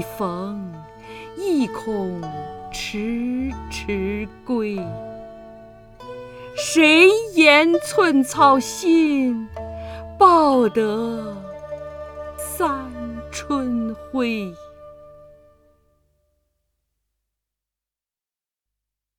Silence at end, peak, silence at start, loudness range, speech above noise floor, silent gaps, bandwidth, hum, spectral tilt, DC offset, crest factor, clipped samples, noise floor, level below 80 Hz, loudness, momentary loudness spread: 4.05 s; 0 dBFS; 0 s; 13 LU; over 71 dB; none; 18.5 kHz; none; -4 dB/octave; under 0.1%; 20 dB; under 0.1%; under -90 dBFS; -46 dBFS; -19 LUFS; 21 LU